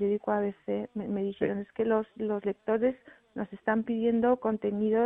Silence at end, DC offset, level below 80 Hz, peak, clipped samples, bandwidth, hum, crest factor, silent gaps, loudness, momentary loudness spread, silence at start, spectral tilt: 0 s; under 0.1%; -64 dBFS; -12 dBFS; under 0.1%; 3.8 kHz; none; 16 dB; none; -30 LUFS; 8 LU; 0 s; -10 dB/octave